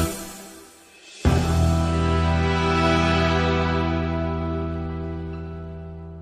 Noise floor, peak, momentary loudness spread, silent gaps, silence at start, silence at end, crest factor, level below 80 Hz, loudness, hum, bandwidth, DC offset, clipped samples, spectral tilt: -47 dBFS; -6 dBFS; 17 LU; none; 0 s; 0 s; 16 dB; -32 dBFS; -22 LUFS; none; 15.5 kHz; under 0.1%; under 0.1%; -6 dB/octave